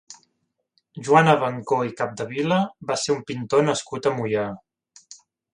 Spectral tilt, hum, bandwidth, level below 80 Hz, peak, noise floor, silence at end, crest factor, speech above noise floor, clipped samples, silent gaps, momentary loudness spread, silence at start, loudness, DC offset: -5 dB/octave; none; 11 kHz; -64 dBFS; -2 dBFS; -75 dBFS; 0.4 s; 22 dB; 53 dB; under 0.1%; none; 11 LU; 0.1 s; -22 LUFS; under 0.1%